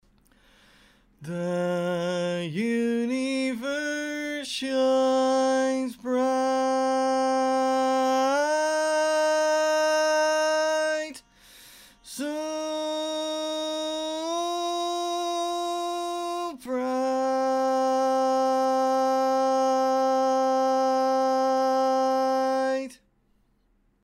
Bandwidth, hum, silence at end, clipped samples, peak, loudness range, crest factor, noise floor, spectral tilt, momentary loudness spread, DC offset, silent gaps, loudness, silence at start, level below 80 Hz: 16 kHz; none; 1.1 s; under 0.1%; -14 dBFS; 6 LU; 10 dB; -67 dBFS; -4 dB/octave; 8 LU; under 0.1%; none; -25 LUFS; 1.2 s; -68 dBFS